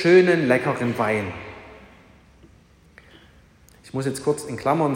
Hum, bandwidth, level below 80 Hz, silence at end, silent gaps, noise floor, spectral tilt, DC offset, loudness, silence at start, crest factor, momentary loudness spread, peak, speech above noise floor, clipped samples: none; 15.5 kHz; -58 dBFS; 0 s; none; -53 dBFS; -6 dB/octave; under 0.1%; -22 LUFS; 0 s; 20 dB; 19 LU; -4 dBFS; 33 dB; under 0.1%